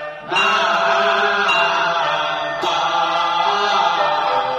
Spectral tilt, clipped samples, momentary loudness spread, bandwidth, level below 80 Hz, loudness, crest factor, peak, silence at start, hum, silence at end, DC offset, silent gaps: -2 dB/octave; under 0.1%; 5 LU; 12 kHz; -58 dBFS; -17 LUFS; 14 dB; -4 dBFS; 0 s; none; 0 s; under 0.1%; none